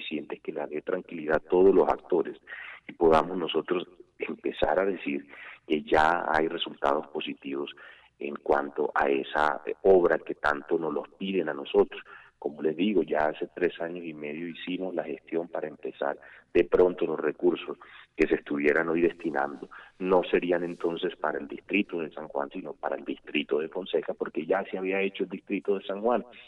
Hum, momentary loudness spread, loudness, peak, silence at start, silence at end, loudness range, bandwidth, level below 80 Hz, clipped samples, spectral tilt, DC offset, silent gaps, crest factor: none; 13 LU; -28 LUFS; -10 dBFS; 0 s; 0.05 s; 5 LU; 8.2 kHz; -56 dBFS; under 0.1%; -6.5 dB/octave; under 0.1%; none; 18 dB